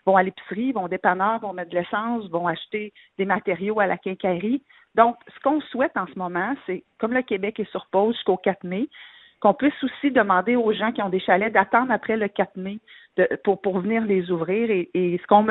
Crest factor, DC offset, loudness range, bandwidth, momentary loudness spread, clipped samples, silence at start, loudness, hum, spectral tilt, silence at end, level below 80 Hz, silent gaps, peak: 22 dB; under 0.1%; 4 LU; 4.1 kHz; 9 LU; under 0.1%; 0.05 s; -23 LUFS; none; -10 dB/octave; 0 s; -64 dBFS; none; 0 dBFS